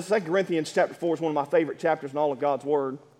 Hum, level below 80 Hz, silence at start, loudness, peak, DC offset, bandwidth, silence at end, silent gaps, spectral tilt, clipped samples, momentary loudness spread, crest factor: none; -80 dBFS; 0 s; -26 LUFS; -10 dBFS; under 0.1%; 14 kHz; 0.2 s; none; -5.5 dB/octave; under 0.1%; 3 LU; 16 dB